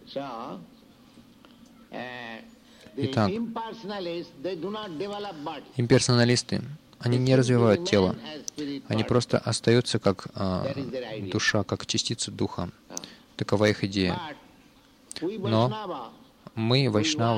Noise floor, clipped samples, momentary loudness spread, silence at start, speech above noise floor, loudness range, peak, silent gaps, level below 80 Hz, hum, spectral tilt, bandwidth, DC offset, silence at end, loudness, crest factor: -56 dBFS; under 0.1%; 17 LU; 0.05 s; 30 dB; 9 LU; -6 dBFS; none; -60 dBFS; none; -5 dB/octave; 11.5 kHz; under 0.1%; 0 s; -27 LUFS; 20 dB